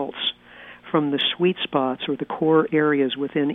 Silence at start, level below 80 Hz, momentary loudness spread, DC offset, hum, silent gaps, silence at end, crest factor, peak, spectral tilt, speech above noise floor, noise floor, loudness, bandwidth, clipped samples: 0 s; -66 dBFS; 8 LU; under 0.1%; 60 Hz at -45 dBFS; none; 0 s; 16 dB; -6 dBFS; -8 dB/octave; 24 dB; -45 dBFS; -22 LUFS; 4.1 kHz; under 0.1%